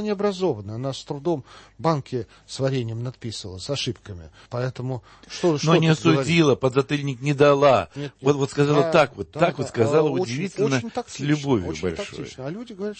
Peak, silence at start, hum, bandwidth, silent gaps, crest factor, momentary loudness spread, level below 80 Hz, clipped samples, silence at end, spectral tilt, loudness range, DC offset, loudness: -4 dBFS; 0 s; none; 8.8 kHz; none; 18 dB; 15 LU; -54 dBFS; under 0.1%; 0.05 s; -6 dB/octave; 8 LU; under 0.1%; -23 LUFS